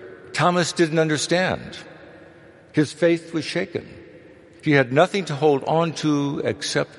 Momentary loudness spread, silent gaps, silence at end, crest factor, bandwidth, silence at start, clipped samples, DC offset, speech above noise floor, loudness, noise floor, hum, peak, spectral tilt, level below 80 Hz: 11 LU; none; 0 s; 20 dB; 11.5 kHz; 0 s; under 0.1%; under 0.1%; 27 dB; -21 LUFS; -48 dBFS; none; -2 dBFS; -5 dB/octave; -60 dBFS